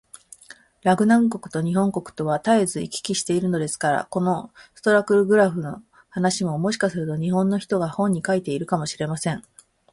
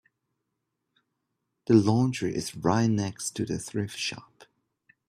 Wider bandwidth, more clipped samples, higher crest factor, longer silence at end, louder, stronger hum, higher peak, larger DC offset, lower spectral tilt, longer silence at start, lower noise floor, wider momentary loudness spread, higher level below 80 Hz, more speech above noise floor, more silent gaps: second, 11.5 kHz vs 15 kHz; neither; about the same, 18 dB vs 22 dB; second, 0.5 s vs 0.85 s; first, -22 LUFS vs -27 LUFS; neither; about the same, -6 dBFS vs -8 dBFS; neither; about the same, -5.5 dB/octave vs -5.5 dB/octave; second, 0.85 s vs 1.7 s; second, -49 dBFS vs -82 dBFS; about the same, 10 LU vs 11 LU; about the same, -60 dBFS vs -62 dBFS; second, 27 dB vs 56 dB; neither